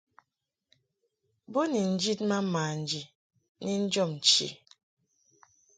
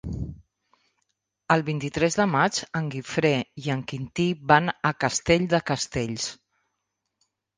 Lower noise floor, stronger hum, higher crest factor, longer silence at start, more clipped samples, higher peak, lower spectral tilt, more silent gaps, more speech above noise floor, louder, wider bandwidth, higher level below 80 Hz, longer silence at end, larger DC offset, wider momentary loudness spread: first, -85 dBFS vs -80 dBFS; neither; about the same, 22 dB vs 24 dB; first, 1.5 s vs 0.05 s; neither; second, -10 dBFS vs -2 dBFS; about the same, -3.5 dB/octave vs -4.5 dB/octave; first, 3.15-3.30 s, 3.49-3.55 s vs none; about the same, 56 dB vs 56 dB; second, -28 LUFS vs -25 LUFS; about the same, 9.4 kHz vs 10 kHz; second, -76 dBFS vs -50 dBFS; about the same, 1.2 s vs 1.25 s; neither; about the same, 13 LU vs 11 LU